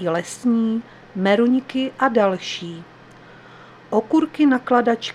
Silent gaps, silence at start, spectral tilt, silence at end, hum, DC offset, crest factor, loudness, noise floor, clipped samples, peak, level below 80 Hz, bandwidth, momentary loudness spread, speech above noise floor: none; 0 s; -5.5 dB/octave; 0 s; none; under 0.1%; 18 dB; -20 LUFS; -44 dBFS; under 0.1%; -2 dBFS; -64 dBFS; 11.5 kHz; 11 LU; 25 dB